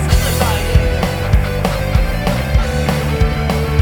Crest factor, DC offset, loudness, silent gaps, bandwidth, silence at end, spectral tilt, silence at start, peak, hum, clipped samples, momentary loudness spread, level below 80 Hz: 14 dB; under 0.1%; -16 LUFS; none; over 20 kHz; 0 s; -5.5 dB/octave; 0 s; 0 dBFS; none; under 0.1%; 3 LU; -18 dBFS